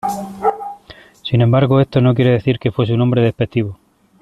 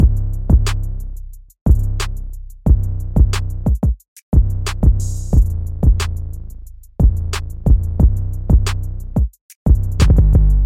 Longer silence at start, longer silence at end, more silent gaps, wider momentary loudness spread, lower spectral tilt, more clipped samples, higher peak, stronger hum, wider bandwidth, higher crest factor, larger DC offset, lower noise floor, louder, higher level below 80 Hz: about the same, 0.05 s vs 0 s; first, 0.45 s vs 0 s; second, none vs 1.61-1.66 s, 4.08-4.16 s, 4.23-4.32 s, 9.41-9.49 s, 9.56-9.66 s; about the same, 12 LU vs 13 LU; first, -8 dB/octave vs -6.5 dB/octave; neither; about the same, -2 dBFS vs 0 dBFS; neither; second, 12.5 kHz vs 14 kHz; about the same, 14 dB vs 14 dB; neither; first, -42 dBFS vs -34 dBFS; about the same, -16 LUFS vs -18 LUFS; second, -46 dBFS vs -16 dBFS